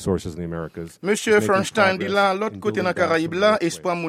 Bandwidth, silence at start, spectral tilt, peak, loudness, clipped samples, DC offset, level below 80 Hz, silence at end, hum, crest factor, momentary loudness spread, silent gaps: 15.5 kHz; 0 s; -4.5 dB/octave; -4 dBFS; -21 LUFS; under 0.1%; under 0.1%; -52 dBFS; 0 s; none; 18 dB; 12 LU; none